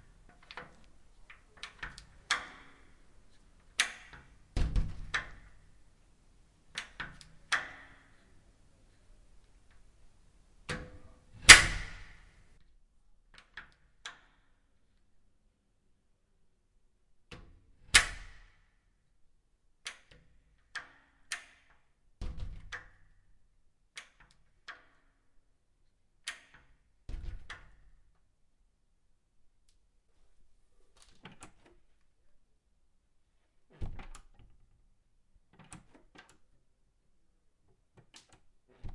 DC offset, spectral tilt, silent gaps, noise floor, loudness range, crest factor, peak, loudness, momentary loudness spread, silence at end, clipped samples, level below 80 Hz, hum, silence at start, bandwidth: under 0.1%; -0.5 dB/octave; none; -71 dBFS; 27 LU; 36 dB; 0 dBFS; -25 LUFS; 26 LU; 0 s; under 0.1%; -48 dBFS; none; 0.55 s; 12 kHz